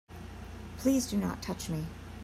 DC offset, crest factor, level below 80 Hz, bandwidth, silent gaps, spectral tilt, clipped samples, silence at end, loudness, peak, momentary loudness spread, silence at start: under 0.1%; 18 dB; -50 dBFS; 16 kHz; none; -5.5 dB/octave; under 0.1%; 0 s; -33 LUFS; -16 dBFS; 16 LU; 0.1 s